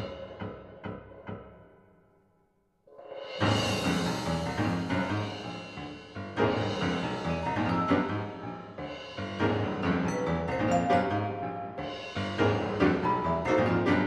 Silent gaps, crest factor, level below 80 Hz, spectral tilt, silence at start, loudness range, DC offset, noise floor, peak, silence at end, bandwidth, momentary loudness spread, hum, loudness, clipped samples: none; 22 dB; -52 dBFS; -6 dB/octave; 0 s; 5 LU; under 0.1%; -70 dBFS; -8 dBFS; 0 s; 13 kHz; 15 LU; none; -30 LUFS; under 0.1%